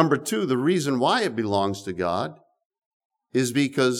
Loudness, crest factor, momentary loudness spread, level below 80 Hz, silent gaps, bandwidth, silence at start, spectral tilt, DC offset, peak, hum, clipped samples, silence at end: -24 LUFS; 20 dB; 7 LU; -66 dBFS; 2.65-2.70 s, 2.86-3.10 s; 17.5 kHz; 0 s; -5 dB/octave; under 0.1%; -4 dBFS; none; under 0.1%; 0 s